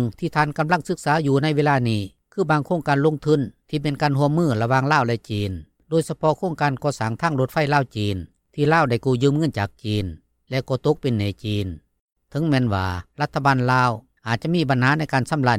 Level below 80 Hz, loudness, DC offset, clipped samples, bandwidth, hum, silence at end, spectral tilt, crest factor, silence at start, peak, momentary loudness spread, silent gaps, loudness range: -52 dBFS; -21 LUFS; under 0.1%; under 0.1%; 14.5 kHz; none; 0 s; -6.5 dB/octave; 18 dB; 0 s; -4 dBFS; 9 LU; 12.00-12.07 s; 3 LU